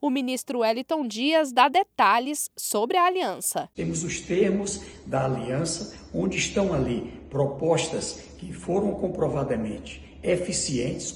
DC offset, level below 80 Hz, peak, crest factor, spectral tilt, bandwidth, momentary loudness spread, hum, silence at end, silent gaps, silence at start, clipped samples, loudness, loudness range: under 0.1%; -50 dBFS; -8 dBFS; 18 dB; -4 dB/octave; 17.5 kHz; 12 LU; none; 0 s; none; 0 s; under 0.1%; -25 LUFS; 5 LU